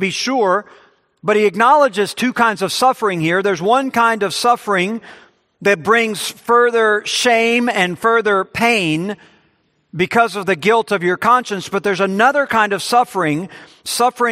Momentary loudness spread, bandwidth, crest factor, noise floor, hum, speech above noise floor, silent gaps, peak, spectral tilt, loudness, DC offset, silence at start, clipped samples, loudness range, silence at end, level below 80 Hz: 8 LU; 15.5 kHz; 16 dB; -60 dBFS; none; 45 dB; none; 0 dBFS; -4 dB/octave; -15 LUFS; under 0.1%; 0 s; under 0.1%; 2 LU; 0 s; -62 dBFS